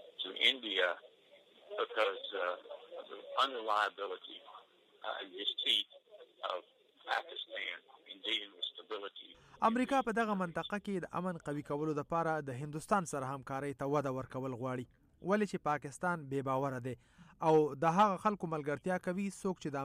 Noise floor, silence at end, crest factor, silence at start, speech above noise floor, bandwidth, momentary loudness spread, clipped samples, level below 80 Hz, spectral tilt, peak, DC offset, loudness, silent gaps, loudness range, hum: -64 dBFS; 0 s; 22 dB; 0 s; 28 dB; 15 kHz; 16 LU; under 0.1%; -72 dBFS; -5 dB/octave; -16 dBFS; under 0.1%; -36 LUFS; none; 5 LU; none